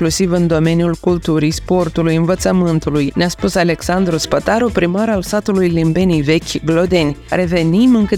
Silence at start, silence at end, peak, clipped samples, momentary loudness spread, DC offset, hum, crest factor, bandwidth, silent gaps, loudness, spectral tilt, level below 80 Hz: 0 s; 0 s; 0 dBFS; under 0.1%; 3 LU; under 0.1%; none; 14 dB; 16 kHz; none; -15 LUFS; -6 dB/octave; -34 dBFS